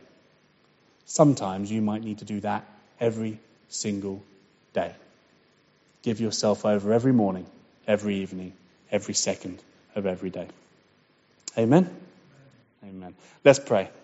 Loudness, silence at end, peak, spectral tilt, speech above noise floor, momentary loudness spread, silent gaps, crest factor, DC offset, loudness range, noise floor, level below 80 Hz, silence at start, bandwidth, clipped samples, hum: -26 LUFS; 0.15 s; -2 dBFS; -6 dB/octave; 38 dB; 21 LU; none; 26 dB; under 0.1%; 6 LU; -63 dBFS; -68 dBFS; 1.1 s; 8 kHz; under 0.1%; none